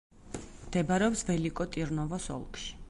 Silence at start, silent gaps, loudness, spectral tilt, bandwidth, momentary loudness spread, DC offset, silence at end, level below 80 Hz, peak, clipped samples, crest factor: 0.15 s; none; -32 LUFS; -5 dB/octave; 11.5 kHz; 16 LU; under 0.1%; 0 s; -48 dBFS; -14 dBFS; under 0.1%; 18 dB